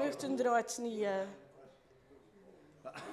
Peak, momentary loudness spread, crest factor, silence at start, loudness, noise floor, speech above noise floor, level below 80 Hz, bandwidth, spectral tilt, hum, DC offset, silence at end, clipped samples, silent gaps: -20 dBFS; 19 LU; 18 dB; 0 s; -36 LUFS; -63 dBFS; 27 dB; -80 dBFS; 14.5 kHz; -4 dB/octave; none; under 0.1%; 0 s; under 0.1%; none